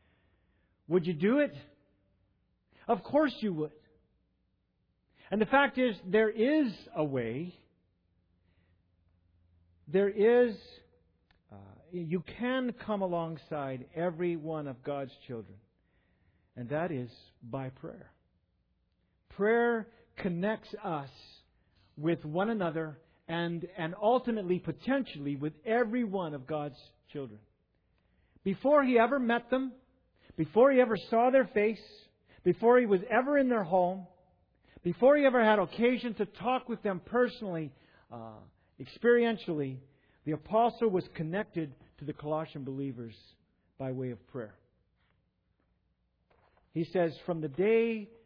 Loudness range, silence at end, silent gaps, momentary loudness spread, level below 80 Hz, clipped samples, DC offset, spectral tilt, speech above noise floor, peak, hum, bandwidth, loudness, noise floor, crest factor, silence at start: 12 LU; 0.2 s; none; 18 LU; -68 dBFS; under 0.1%; under 0.1%; -5 dB/octave; 46 dB; -12 dBFS; none; 5.4 kHz; -31 LUFS; -76 dBFS; 20 dB; 0.9 s